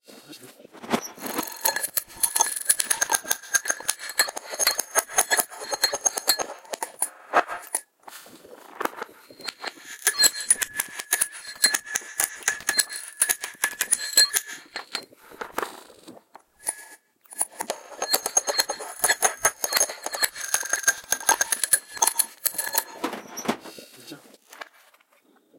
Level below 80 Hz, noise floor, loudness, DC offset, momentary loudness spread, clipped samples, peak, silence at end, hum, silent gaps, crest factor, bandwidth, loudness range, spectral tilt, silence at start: -68 dBFS; -61 dBFS; -24 LUFS; under 0.1%; 16 LU; under 0.1%; -2 dBFS; 0.95 s; none; none; 26 dB; 17 kHz; 7 LU; 1 dB/octave; 0.1 s